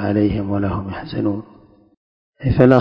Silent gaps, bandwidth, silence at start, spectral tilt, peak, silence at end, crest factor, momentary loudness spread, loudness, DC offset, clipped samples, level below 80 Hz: 1.97-2.33 s; 5.6 kHz; 0 s; -10 dB/octave; 0 dBFS; 0 s; 18 dB; 12 LU; -20 LUFS; under 0.1%; 0.2%; -36 dBFS